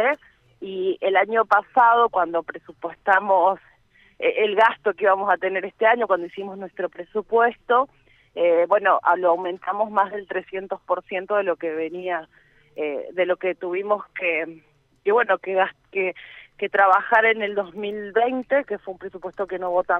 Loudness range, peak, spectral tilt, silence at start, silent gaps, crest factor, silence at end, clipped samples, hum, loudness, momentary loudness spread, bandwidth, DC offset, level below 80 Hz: 6 LU; -4 dBFS; -6 dB/octave; 0 s; none; 18 dB; 0 s; under 0.1%; none; -22 LUFS; 14 LU; 6 kHz; under 0.1%; -66 dBFS